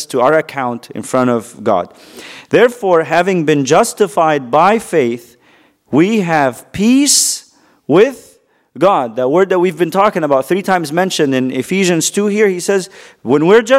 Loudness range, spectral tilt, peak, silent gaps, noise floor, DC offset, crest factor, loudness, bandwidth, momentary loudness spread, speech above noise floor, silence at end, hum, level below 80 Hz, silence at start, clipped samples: 2 LU; -4 dB/octave; 0 dBFS; none; -50 dBFS; under 0.1%; 14 dB; -13 LUFS; 16 kHz; 8 LU; 38 dB; 0 s; none; -56 dBFS; 0 s; under 0.1%